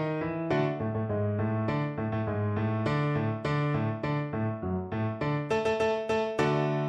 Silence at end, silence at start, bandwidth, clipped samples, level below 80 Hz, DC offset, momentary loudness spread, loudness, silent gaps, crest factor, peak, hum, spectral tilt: 0 s; 0 s; 9.2 kHz; under 0.1%; -56 dBFS; under 0.1%; 4 LU; -30 LUFS; none; 16 dB; -14 dBFS; none; -8 dB/octave